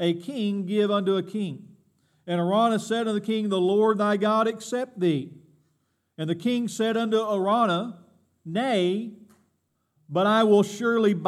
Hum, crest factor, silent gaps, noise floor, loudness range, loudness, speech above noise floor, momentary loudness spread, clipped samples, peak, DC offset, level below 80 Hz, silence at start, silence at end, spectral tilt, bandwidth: none; 18 dB; none; -73 dBFS; 3 LU; -24 LUFS; 50 dB; 10 LU; under 0.1%; -8 dBFS; under 0.1%; -82 dBFS; 0 s; 0 s; -6 dB/octave; 13.5 kHz